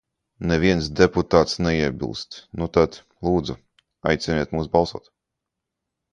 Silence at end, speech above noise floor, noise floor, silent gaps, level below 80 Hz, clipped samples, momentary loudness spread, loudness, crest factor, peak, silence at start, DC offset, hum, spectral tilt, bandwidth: 1.15 s; 62 dB; -83 dBFS; none; -40 dBFS; under 0.1%; 12 LU; -22 LUFS; 22 dB; 0 dBFS; 0.4 s; under 0.1%; none; -6 dB/octave; 9.8 kHz